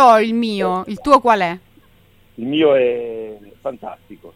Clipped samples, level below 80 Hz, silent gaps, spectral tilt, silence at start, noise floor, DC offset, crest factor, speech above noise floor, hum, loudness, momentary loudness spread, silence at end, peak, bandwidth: under 0.1%; -50 dBFS; none; -5.5 dB/octave; 0 s; -51 dBFS; under 0.1%; 16 dB; 34 dB; none; -16 LUFS; 20 LU; 0.05 s; 0 dBFS; 15 kHz